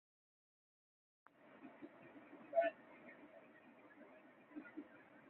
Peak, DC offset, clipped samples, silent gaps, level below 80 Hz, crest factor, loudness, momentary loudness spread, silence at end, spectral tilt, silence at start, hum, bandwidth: -26 dBFS; under 0.1%; under 0.1%; none; under -90 dBFS; 26 dB; -45 LUFS; 24 LU; 0 s; -3 dB/octave; 1.35 s; none; 4 kHz